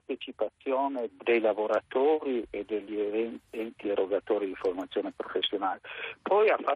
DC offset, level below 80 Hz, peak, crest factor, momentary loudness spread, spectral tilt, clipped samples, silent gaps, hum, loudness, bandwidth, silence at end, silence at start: under 0.1%; -70 dBFS; -14 dBFS; 16 dB; 10 LU; -5.5 dB/octave; under 0.1%; none; none; -30 LUFS; 6.8 kHz; 0 s; 0.1 s